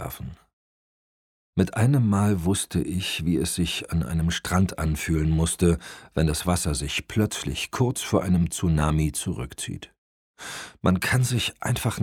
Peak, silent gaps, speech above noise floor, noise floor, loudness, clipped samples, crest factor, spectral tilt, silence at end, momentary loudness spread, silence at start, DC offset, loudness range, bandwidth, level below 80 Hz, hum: -4 dBFS; 0.53-1.53 s, 9.98-10.34 s; over 66 dB; under -90 dBFS; -25 LUFS; under 0.1%; 20 dB; -5 dB/octave; 0 s; 10 LU; 0 s; under 0.1%; 2 LU; 17.5 kHz; -38 dBFS; none